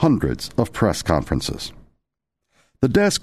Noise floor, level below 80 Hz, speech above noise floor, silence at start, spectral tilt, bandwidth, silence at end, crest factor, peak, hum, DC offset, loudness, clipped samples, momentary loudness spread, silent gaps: -81 dBFS; -38 dBFS; 61 dB; 0 s; -5.5 dB/octave; 13.5 kHz; 0.05 s; 18 dB; -2 dBFS; none; 0.5%; -21 LUFS; under 0.1%; 10 LU; none